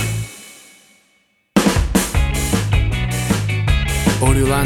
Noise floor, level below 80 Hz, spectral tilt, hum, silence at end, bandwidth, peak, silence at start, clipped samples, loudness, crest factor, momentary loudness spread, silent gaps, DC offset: -60 dBFS; -24 dBFS; -5 dB/octave; none; 0 s; 18 kHz; 0 dBFS; 0 s; under 0.1%; -18 LUFS; 16 dB; 9 LU; none; under 0.1%